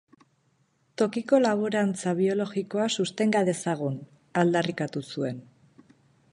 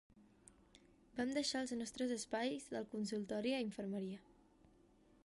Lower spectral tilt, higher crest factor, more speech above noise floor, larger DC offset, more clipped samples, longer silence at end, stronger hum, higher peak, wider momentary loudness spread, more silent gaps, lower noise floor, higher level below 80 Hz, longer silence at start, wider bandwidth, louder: first, -5.5 dB/octave vs -4 dB/octave; about the same, 18 dB vs 18 dB; first, 43 dB vs 28 dB; neither; neither; second, 0.9 s vs 1.05 s; neither; first, -8 dBFS vs -28 dBFS; first, 10 LU vs 7 LU; neither; about the same, -68 dBFS vs -70 dBFS; about the same, -74 dBFS vs -76 dBFS; first, 1 s vs 0.15 s; about the same, 11.5 kHz vs 11.5 kHz; first, -27 LUFS vs -42 LUFS